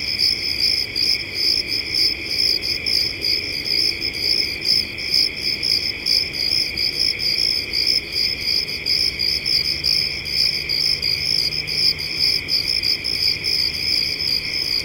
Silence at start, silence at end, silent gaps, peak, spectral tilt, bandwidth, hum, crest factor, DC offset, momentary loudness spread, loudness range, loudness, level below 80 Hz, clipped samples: 0 s; 0 s; none; -4 dBFS; -1 dB/octave; 17 kHz; none; 16 dB; under 0.1%; 2 LU; 1 LU; -17 LUFS; -44 dBFS; under 0.1%